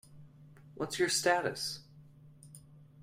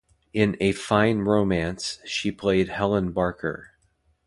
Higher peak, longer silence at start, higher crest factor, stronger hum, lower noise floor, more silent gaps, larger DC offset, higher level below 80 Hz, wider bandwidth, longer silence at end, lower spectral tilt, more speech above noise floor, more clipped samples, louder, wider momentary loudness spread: second, -16 dBFS vs -4 dBFS; second, 0.1 s vs 0.35 s; about the same, 22 dB vs 20 dB; neither; second, -57 dBFS vs -67 dBFS; neither; neither; second, -72 dBFS vs -48 dBFS; first, 15.5 kHz vs 11.5 kHz; second, 0 s vs 0.6 s; second, -2.5 dB/octave vs -5.5 dB/octave; second, 24 dB vs 43 dB; neither; second, -32 LUFS vs -24 LUFS; first, 26 LU vs 10 LU